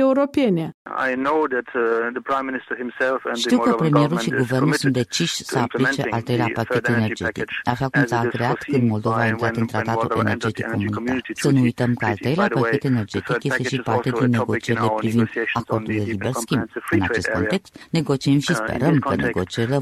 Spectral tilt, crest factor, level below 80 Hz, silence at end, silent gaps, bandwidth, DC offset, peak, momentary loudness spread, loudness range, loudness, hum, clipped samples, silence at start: -6 dB/octave; 18 dB; -52 dBFS; 0 s; 0.74-0.85 s; 14 kHz; under 0.1%; -4 dBFS; 5 LU; 2 LU; -21 LUFS; none; under 0.1%; 0 s